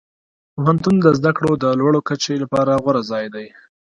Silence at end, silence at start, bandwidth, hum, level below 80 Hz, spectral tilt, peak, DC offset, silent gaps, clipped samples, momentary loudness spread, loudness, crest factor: 0.4 s; 0.55 s; 11 kHz; none; -52 dBFS; -6.5 dB/octave; 0 dBFS; under 0.1%; none; under 0.1%; 11 LU; -17 LUFS; 18 dB